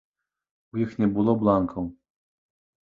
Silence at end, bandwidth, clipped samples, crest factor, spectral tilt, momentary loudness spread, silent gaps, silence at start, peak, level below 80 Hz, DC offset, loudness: 1 s; 5 kHz; under 0.1%; 20 dB; -10.5 dB/octave; 13 LU; none; 0.75 s; -6 dBFS; -54 dBFS; under 0.1%; -24 LUFS